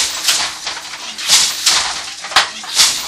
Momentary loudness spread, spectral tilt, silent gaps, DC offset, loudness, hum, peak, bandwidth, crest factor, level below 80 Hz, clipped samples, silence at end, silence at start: 13 LU; 2.5 dB/octave; none; under 0.1%; -13 LUFS; none; 0 dBFS; over 20 kHz; 16 dB; -50 dBFS; under 0.1%; 0 s; 0 s